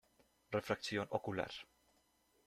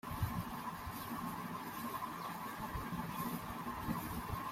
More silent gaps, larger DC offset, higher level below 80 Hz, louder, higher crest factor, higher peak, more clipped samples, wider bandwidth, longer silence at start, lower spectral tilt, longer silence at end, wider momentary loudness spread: neither; neither; second, -74 dBFS vs -56 dBFS; about the same, -41 LUFS vs -43 LUFS; first, 24 dB vs 16 dB; first, -20 dBFS vs -26 dBFS; neither; second, 14.5 kHz vs 16 kHz; first, 0.5 s vs 0.05 s; about the same, -5 dB/octave vs -5.5 dB/octave; first, 0.8 s vs 0 s; first, 10 LU vs 3 LU